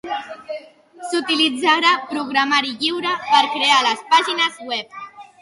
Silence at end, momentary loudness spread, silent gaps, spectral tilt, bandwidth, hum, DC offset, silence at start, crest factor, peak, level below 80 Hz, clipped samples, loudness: 0.2 s; 18 LU; none; -1 dB/octave; 11.5 kHz; none; under 0.1%; 0.05 s; 18 dB; -2 dBFS; -70 dBFS; under 0.1%; -17 LUFS